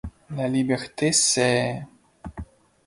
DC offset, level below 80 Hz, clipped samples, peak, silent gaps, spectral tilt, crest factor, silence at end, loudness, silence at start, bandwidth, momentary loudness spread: under 0.1%; -48 dBFS; under 0.1%; -6 dBFS; none; -3.5 dB/octave; 20 dB; 0.4 s; -22 LUFS; 0.05 s; 11.5 kHz; 22 LU